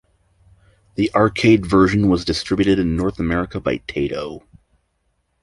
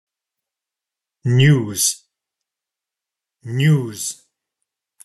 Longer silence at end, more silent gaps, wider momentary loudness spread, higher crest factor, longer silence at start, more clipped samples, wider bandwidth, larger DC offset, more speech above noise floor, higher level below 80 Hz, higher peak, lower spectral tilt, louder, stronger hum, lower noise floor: first, 1.05 s vs 0.9 s; neither; second, 11 LU vs 14 LU; about the same, 18 dB vs 18 dB; second, 1 s vs 1.25 s; neither; about the same, 11.5 kHz vs 12.5 kHz; neither; second, 50 dB vs 70 dB; first, -38 dBFS vs -60 dBFS; about the same, -2 dBFS vs -2 dBFS; first, -6.5 dB/octave vs -4.5 dB/octave; about the same, -18 LUFS vs -18 LUFS; neither; second, -68 dBFS vs -86 dBFS